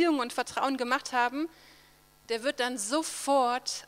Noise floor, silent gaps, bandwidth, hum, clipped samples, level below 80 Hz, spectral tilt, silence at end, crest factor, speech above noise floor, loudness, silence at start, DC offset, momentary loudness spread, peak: -60 dBFS; none; 16.5 kHz; none; under 0.1%; -70 dBFS; -1.5 dB/octave; 0 s; 18 dB; 30 dB; -29 LUFS; 0 s; under 0.1%; 6 LU; -12 dBFS